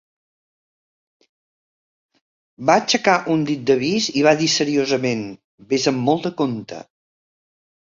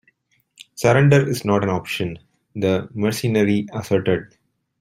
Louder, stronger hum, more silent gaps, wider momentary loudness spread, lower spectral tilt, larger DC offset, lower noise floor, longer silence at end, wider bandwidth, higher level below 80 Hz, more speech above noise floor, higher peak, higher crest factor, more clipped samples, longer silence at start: about the same, -19 LUFS vs -20 LUFS; neither; first, 5.44-5.58 s vs none; about the same, 10 LU vs 11 LU; second, -4 dB/octave vs -6.5 dB/octave; neither; first, under -90 dBFS vs -63 dBFS; first, 1.1 s vs 0.55 s; second, 7.6 kHz vs 16 kHz; second, -62 dBFS vs -54 dBFS; first, over 71 dB vs 44 dB; about the same, -2 dBFS vs -2 dBFS; about the same, 20 dB vs 20 dB; neither; first, 2.6 s vs 0.6 s